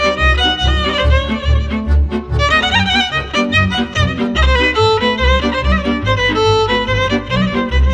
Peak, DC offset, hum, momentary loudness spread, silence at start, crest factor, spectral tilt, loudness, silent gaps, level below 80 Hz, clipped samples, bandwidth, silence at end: 0 dBFS; under 0.1%; none; 4 LU; 0 s; 12 dB; -5.5 dB/octave; -14 LUFS; none; -18 dBFS; under 0.1%; 8.6 kHz; 0 s